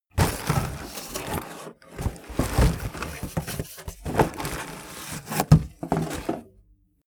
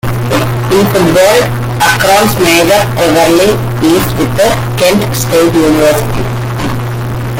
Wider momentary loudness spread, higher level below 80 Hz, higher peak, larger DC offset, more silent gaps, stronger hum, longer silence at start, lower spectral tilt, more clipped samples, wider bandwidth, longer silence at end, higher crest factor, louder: first, 16 LU vs 9 LU; second, -36 dBFS vs -28 dBFS; about the same, -2 dBFS vs 0 dBFS; neither; neither; neither; about the same, 0.15 s vs 0.05 s; about the same, -5.5 dB/octave vs -5 dB/octave; neither; first, over 20 kHz vs 17.5 kHz; first, 0.6 s vs 0 s; first, 26 dB vs 8 dB; second, -27 LUFS vs -9 LUFS